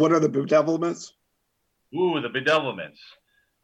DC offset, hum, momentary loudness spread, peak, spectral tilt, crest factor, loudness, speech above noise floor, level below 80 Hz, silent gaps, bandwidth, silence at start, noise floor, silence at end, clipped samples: under 0.1%; none; 16 LU; -8 dBFS; -5.5 dB/octave; 16 dB; -23 LUFS; 51 dB; -74 dBFS; none; 8.8 kHz; 0 s; -74 dBFS; 0.75 s; under 0.1%